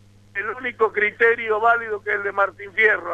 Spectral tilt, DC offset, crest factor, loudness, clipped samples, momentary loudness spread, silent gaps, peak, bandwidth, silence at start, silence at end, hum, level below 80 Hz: -5 dB/octave; under 0.1%; 16 dB; -20 LUFS; under 0.1%; 10 LU; none; -4 dBFS; 7.6 kHz; 0.35 s; 0 s; none; -60 dBFS